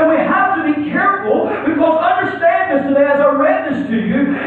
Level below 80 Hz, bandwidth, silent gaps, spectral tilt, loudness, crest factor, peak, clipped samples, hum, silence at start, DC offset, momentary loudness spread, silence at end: -52 dBFS; 4.4 kHz; none; -8.5 dB/octave; -14 LUFS; 12 dB; -2 dBFS; under 0.1%; none; 0 s; under 0.1%; 5 LU; 0 s